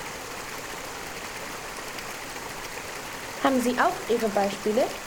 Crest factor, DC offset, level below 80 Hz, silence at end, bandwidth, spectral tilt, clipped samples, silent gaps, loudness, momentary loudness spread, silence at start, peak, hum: 22 dB; under 0.1%; -54 dBFS; 0 s; over 20 kHz; -3.5 dB/octave; under 0.1%; none; -29 LUFS; 11 LU; 0 s; -8 dBFS; none